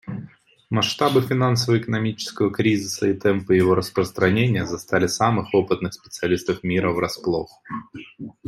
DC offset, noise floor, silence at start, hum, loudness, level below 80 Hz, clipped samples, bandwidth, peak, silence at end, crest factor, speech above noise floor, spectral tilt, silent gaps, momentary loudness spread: under 0.1%; -45 dBFS; 0.05 s; none; -21 LUFS; -56 dBFS; under 0.1%; 16 kHz; -4 dBFS; 0.15 s; 18 dB; 24 dB; -5.5 dB/octave; none; 15 LU